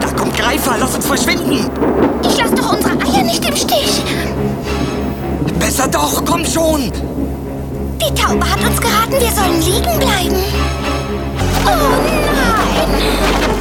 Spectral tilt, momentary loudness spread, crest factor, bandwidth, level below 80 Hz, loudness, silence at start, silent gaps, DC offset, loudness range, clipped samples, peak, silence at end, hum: -4 dB/octave; 6 LU; 14 dB; 18.5 kHz; -24 dBFS; -14 LUFS; 0 s; none; under 0.1%; 2 LU; under 0.1%; 0 dBFS; 0 s; none